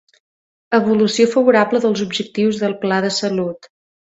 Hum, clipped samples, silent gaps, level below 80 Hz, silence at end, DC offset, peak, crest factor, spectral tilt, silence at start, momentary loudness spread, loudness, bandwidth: none; under 0.1%; none; -60 dBFS; 0.6 s; under 0.1%; 0 dBFS; 18 dB; -5 dB/octave; 0.7 s; 8 LU; -17 LUFS; 8.2 kHz